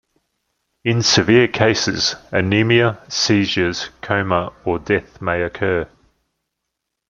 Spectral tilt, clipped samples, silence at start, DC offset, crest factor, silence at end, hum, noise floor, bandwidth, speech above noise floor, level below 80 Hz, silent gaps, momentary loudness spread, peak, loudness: -4.5 dB/octave; under 0.1%; 0.85 s; under 0.1%; 18 dB; 1.25 s; none; -78 dBFS; 7.4 kHz; 61 dB; -50 dBFS; none; 10 LU; 0 dBFS; -17 LUFS